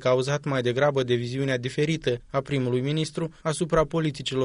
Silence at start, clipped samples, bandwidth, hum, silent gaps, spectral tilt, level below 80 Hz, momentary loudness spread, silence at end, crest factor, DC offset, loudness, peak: 0 s; under 0.1%; 10.5 kHz; none; none; -6 dB/octave; -50 dBFS; 5 LU; 0 s; 16 dB; under 0.1%; -26 LUFS; -8 dBFS